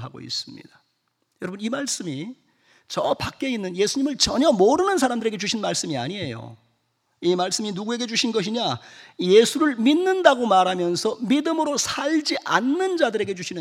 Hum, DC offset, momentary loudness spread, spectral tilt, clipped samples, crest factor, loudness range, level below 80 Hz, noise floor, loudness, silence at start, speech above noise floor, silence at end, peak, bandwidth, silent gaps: none; under 0.1%; 12 LU; -3.5 dB/octave; under 0.1%; 22 dB; 7 LU; -56 dBFS; -72 dBFS; -22 LUFS; 0 s; 50 dB; 0 s; 0 dBFS; 16 kHz; none